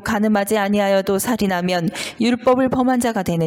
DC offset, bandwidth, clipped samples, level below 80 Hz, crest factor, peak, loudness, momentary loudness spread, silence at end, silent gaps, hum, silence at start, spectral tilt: under 0.1%; 17 kHz; under 0.1%; -48 dBFS; 12 dB; -6 dBFS; -18 LUFS; 4 LU; 0 s; none; none; 0 s; -5 dB/octave